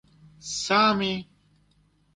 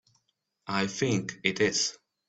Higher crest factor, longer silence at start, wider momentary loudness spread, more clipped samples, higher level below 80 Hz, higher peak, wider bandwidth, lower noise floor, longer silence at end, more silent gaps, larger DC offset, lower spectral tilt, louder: second, 18 dB vs 24 dB; second, 0.45 s vs 0.65 s; first, 14 LU vs 6 LU; neither; about the same, -62 dBFS vs -66 dBFS; second, -10 dBFS vs -6 dBFS; first, 11 kHz vs 8.4 kHz; second, -64 dBFS vs -77 dBFS; first, 0.9 s vs 0.35 s; neither; neither; about the same, -3.5 dB/octave vs -3.5 dB/octave; first, -24 LUFS vs -28 LUFS